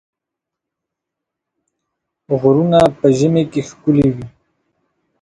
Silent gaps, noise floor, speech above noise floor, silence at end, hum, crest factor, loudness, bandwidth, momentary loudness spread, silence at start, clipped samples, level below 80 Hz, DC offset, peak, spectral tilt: none; -83 dBFS; 69 dB; 0.95 s; none; 18 dB; -14 LUFS; 11 kHz; 10 LU; 2.3 s; under 0.1%; -48 dBFS; under 0.1%; 0 dBFS; -7.5 dB/octave